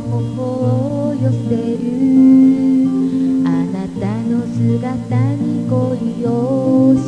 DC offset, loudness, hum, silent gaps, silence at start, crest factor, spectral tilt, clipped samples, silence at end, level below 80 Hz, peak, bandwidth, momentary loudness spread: 0.2%; -15 LUFS; none; none; 0 s; 12 dB; -9.5 dB/octave; under 0.1%; 0 s; -48 dBFS; -2 dBFS; 9.4 kHz; 9 LU